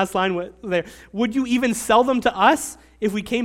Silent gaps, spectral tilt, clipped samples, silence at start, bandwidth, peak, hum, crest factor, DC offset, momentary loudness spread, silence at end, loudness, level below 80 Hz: none; -4 dB/octave; under 0.1%; 0 s; 16.5 kHz; -2 dBFS; none; 18 dB; under 0.1%; 10 LU; 0 s; -21 LUFS; -50 dBFS